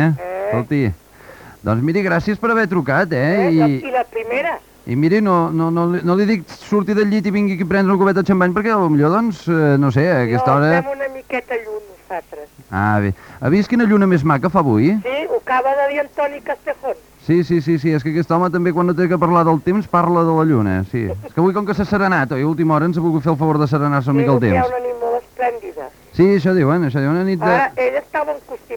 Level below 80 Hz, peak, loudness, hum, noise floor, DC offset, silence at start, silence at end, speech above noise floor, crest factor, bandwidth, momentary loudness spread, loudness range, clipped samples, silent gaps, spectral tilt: -48 dBFS; -2 dBFS; -17 LUFS; none; -40 dBFS; under 0.1%; 0 s; 0 s; 24 dB; 16 dB; 20 kHz; 10 LU; 3 LU; under 0.1%; none; -8.5 dB/octave